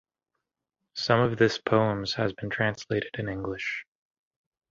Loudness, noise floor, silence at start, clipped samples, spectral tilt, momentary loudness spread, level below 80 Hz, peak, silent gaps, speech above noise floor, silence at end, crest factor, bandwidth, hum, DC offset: -27 LUFS; -85 dBFS; 0.95 s; under 0.1%; -6 dB/octave; 10 LU; -58 dBFS; -6 dBFS; none; 58 dB; 0.9 s; 22 dB; 7.6 kHz; none; under 0.1%